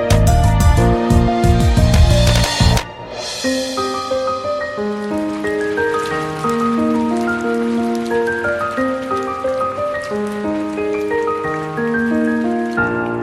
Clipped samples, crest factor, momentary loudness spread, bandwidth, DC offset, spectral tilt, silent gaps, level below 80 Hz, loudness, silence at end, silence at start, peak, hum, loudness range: under 0.1%; 16 dB; 8 LU; 16 kHz; under 0.1%; -6 dB/octave; none; -24 dBFS; -17 LUFS; 0 s; 0 s; 0 dBFS; none; 5 LU